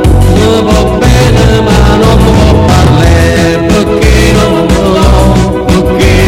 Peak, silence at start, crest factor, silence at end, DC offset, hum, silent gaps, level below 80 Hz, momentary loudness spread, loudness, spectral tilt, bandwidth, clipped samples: 0 dBFS; 0 s; 4 dB; 0 s; under 0.1%; none; none; -10 dBFS; 3 LU; -6 LUFS; -6 dB/octave; 16 kHz; 4%